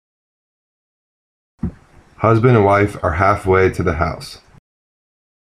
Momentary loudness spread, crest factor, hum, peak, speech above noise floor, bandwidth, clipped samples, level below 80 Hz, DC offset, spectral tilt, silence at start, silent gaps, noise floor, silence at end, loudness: 16 LU; 18 dB; none; 0 dBFS; 31 dB; 13 kHz; under 0.1%; -40 dBFS; under 0.1%; -8 dB/octave; 1.65 s; none; -45 dBFS; 1.1 s; -15 LUFS